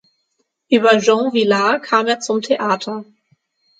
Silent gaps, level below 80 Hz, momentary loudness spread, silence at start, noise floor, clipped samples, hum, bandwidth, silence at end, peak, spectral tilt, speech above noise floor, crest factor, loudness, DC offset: none; -72 dBFS; 8 LU; 0.7 s; -69 dBFS; under 0.1%; none; 9.2 kHz; 0.75 s; 0 dBFS; -4 dB/octave; 54 dB; 18 dB; -16 LUFS; under 0.1%